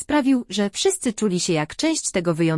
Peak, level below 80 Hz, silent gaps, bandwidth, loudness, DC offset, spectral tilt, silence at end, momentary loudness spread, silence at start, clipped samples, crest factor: -6 dBFS; -54 dBFS; none; 12 kHz; -21 LUFS; under 0.1%; -4 dB/octave; 0 s; 3 LU; 0 s; under 0.1%; 14 dB